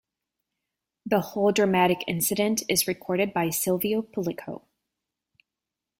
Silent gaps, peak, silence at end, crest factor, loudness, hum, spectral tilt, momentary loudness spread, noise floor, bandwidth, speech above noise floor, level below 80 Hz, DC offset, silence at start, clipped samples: none; -8 dBFS; 1.4 s; 20 dB; -25 LUFS; none; -4 dB/octave; 12 LU; -88 dBFS; 16.5 kHz; 63 dB; -64 dBFS; under 0.1%; 1.05 s; under 0.1%